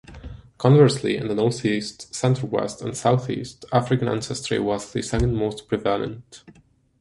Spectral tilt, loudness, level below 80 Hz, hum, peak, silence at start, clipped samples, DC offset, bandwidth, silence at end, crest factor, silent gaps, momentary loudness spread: -6 dB/octave; -23 LUFS; -42 dBFS; none; -2 dBFS; 0.1 s; under 0.1%; under 0.1%; 11.5 kHz; 0.65 s; 20 dB; none; 13 LU